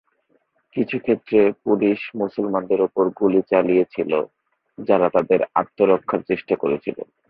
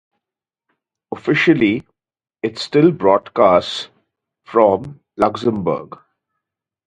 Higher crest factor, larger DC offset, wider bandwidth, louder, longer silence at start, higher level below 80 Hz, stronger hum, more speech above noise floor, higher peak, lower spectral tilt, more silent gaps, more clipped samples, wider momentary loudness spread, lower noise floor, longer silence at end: about the same, 18 dB vs 18 dB; neither; second, 5.2 kHz vs 9.6 kHz; second, -20 LUFS vs -17 LUFS; second, 0.75 s vs 1.1 s; second, -62 dBFS vs -54 dBFS; neither; second, 46 dB vs 71 dB; about the same, -2 dBFS vs 0 dBFS; first, -10 dB/octave vs -6.5 dB/octave; neither; neither; second, 8 LU vs 13 LU; second, -65 dBFS vs -87 dBFS; second, 0.25 s vs 1 s